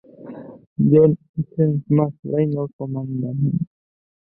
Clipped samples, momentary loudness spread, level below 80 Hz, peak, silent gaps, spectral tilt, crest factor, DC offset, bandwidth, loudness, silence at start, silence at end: under 0.1%; 21 LU; -56 dBFS; -2 dBFS; 0.67-0.76 s, 1.29-1.34 s, 2.19-2.23 s, 2.73-2.79 s; -15 dB/octave; 18 dB; under 0.1%; 3 kHz; -20 LUFS; 0.2 s; 0.6 s